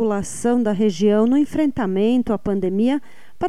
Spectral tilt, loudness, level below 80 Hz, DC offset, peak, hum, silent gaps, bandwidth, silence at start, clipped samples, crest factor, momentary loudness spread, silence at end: -6.5 dB/octave; -19 LUFS; -48 dBFS; 2%; -6 dBFS; none; none; 13 kHz; 0 s; under 0.1%; 12 dB; 5 LU; 0 s